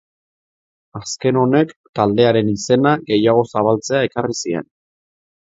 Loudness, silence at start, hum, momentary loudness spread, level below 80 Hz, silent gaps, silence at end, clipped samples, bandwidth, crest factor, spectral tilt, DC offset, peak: -17 LUFS; 0.95 s; none; 10 LU; -54 dBFS; 1.76-1.93 s; 0.85 s; under 0.1%; 8 kHz; 18 dB; -5.5 dB/octave; under 0.1%; 0 dBFS